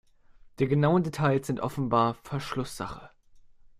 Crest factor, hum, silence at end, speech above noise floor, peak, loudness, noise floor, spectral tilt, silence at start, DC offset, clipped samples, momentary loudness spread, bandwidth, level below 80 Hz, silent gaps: 18 dB; none; 0.1 s; 28 dB; -10 dBFS; -28 LUFS; -55 dBFS; -7 dB/octave; 0.45 s; under 0.1%; under 0.1%; 13 LU; 15 kHz; -56 dBFS; none